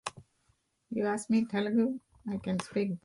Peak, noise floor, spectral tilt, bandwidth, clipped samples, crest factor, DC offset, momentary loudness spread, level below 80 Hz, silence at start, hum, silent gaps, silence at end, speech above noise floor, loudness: -16 dBFS; -73 dBFS; -6 dB/octave; 11.5 kHz; under 0.1%; 16 dB; under 0.1%; 11 LU; -68 dBFS; 0.05 s; none; none; 0.05 s; 43 dB; -32 LUFS